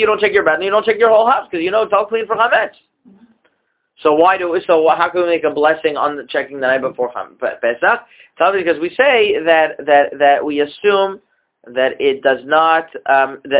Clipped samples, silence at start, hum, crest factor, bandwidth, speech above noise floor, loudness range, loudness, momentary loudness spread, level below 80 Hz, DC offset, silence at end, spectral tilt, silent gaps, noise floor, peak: under 0.1%; 0 s; none; 14 dB; 4 kHz; 52 dB; 3 LU; -15 LUFS; 8 LU; -58 dBFS; under 0.1%; 0 s; -7.5 dB/octave; none; -66 dBFS; 0 dBFS